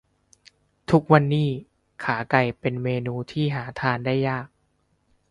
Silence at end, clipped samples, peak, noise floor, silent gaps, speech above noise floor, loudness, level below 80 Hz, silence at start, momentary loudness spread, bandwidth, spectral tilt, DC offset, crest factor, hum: 0.85 s; under 0.1%; -2 dBFS; -68 dBFS; none; 46 dB; -23 LUFS; -56 dBFS; 0.9 s; 13 LU; 10.5 kHz; -8 dB/octave; under 0.1%; 22 dB; none